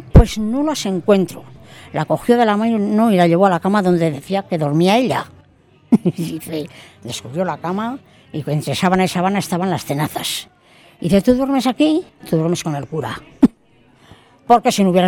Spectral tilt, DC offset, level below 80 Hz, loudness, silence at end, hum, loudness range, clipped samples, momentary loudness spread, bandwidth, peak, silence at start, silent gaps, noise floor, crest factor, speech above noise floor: -6 dB/octave; under 0.1%; -30 dBFS; -17 LUFS; 0 s; none; 5 LU; under 0.1%; 13 LU; 18.5 kHz; 0 dBFS; 0 s; none; -52 dBFS; 16 dB; 36 dB